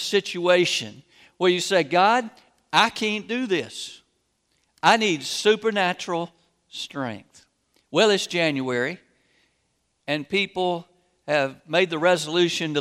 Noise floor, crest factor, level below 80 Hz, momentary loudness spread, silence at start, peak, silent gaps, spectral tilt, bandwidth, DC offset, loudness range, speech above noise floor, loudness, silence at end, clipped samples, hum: -71 dBFS; 22 dB; -72 dBFS; 15 LU; 0 s; -2 dBFS; none; -3.5 dB/octave; 15.5 kHz; under 0.1%; 4 LU; 49 dB; -22 LUFS; 0 s; under 0.1%; none